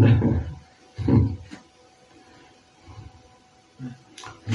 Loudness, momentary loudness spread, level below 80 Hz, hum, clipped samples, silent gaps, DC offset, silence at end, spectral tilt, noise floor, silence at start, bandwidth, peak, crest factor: -23 LUFS; 25 LU; -42 dBFS; none; under 0.1%; none; under 0.1%; 0 s; -8.5 dB/octave; -56 dBFS; 0 s; 7.2 kHz; -6 dBFS; 20 dB